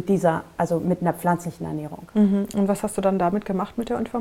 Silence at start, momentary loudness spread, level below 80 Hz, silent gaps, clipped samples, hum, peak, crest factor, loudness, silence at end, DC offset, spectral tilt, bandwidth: 0 s; 8 LU; -52 dBFS; none; under 0.1%; none; -6 dBFS; 16 dB; -24 LUFS; 0 s; under 0.1%; -7.5 dB/octave; 15.5 kHz